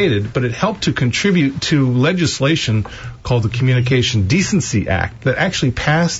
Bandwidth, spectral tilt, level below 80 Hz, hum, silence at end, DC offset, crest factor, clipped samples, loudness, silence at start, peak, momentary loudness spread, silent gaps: 8 kHz; -5 dB/octave; -38 dBFS; none; 0 s; under 0.1%; 12 dB; under 0.1%; -16 LUFS; 0 s; -4 dBFS; 5 LU; none